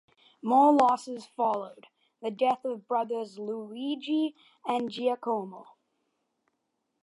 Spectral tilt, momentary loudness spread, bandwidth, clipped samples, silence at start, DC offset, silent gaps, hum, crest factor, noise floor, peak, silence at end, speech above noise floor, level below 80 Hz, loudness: -5.5 dB/octave; 16 LU; 11.5 kHz; under 0.1%; 0.45 s; under 0.1%; none; none; 22 dB; -80 dBFS; -8 dBFS; 1.4 s; 52 dB; -84 dBFS; -28 LUFS